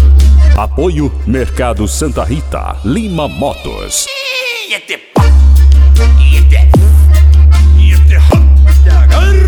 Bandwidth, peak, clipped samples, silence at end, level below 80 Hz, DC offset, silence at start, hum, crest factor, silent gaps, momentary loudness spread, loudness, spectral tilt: 13 kHz; 0 dBFS; 0.6%; 0 s; -8 dBFS; under 0.1%; 0 s; none; 6 dB; none; 10 LU; -9 LUFS; -6 dB/octave